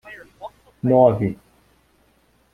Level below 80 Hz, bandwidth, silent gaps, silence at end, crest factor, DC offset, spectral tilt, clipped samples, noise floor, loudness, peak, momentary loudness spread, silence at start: -54 dBFS; 4.7 kHz; none; 1.2 s; 20 dB; under 0.1%; -10 dB/octave; under 0.1%; -60 dBFS; -18 LUFS; -2 dBFS; 25 LU; 0.05 s